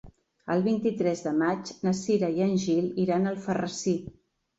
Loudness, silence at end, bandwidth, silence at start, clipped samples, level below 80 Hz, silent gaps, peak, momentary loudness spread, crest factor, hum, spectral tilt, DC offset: -27 LUFS; 0.45 s; 8 kHz; 0.05 s; under 0.1%; -62 dBFS; none; -14 dBFS; 5 LU; 14 dB; none; -6 dB/octave; under 0.1%